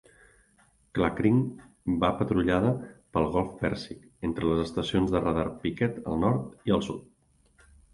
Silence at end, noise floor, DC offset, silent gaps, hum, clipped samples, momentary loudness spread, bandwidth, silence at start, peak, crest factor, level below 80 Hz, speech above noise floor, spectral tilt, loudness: 0.9 s; -64 dBFS; under 0.1%; none; none; under 0.1%; 11 LU; 11.5 kHz; 0.95 s; -10 dBFS; 20 dB; -48 dBFS; 37 dB; -7.5 dB/octave; -28 LUFS